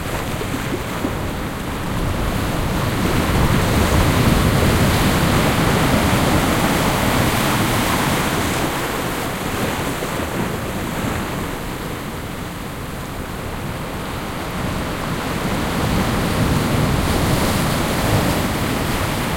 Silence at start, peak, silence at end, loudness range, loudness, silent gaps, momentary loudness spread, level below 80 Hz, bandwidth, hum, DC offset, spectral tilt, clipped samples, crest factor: 0 s; -2 dBFS; 0 s; 10 LU; -19 LUFS; none; 10 LU; -28 dBFS; 16.5 kHz; none; under 0.1%; -5 dB/octave; under 0.1%; 16 dB